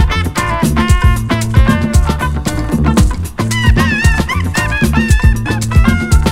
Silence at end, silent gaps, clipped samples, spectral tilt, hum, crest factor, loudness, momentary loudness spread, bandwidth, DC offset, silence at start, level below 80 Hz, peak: 0 s; none; 0.5%; -5.5 dB/octave; none; 10 dB; -13 LUFS; 5 LU; 16.5 kHz; under 0.1%; 0 s; -16 dBFS; 0 dBFS